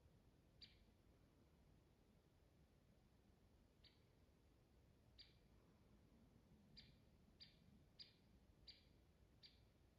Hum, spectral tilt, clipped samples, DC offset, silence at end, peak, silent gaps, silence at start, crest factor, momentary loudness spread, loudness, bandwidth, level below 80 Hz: none; -3.5 dB/octave; under 0.1%; under 0.1%; 0 s; -50 dBFS; none; 0 s; 24 dB; 4 LU; -68 LUFS; 6.8 kHz; -80 dBFS